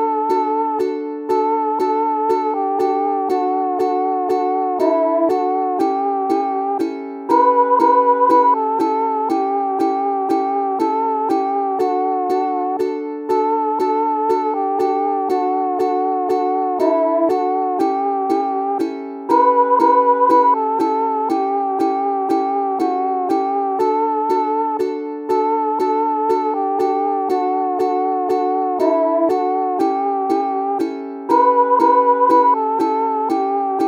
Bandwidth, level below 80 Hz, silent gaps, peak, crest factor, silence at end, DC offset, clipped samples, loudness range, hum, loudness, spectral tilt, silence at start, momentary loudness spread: 15 kHz; -72 dBFS; none; -2 dBFS; 14 dB; 0 s; under 0.1%; under 0.1%; 3 LU; none; -17 LUFS; -5.5 dB/octave; 0 s; 7 LU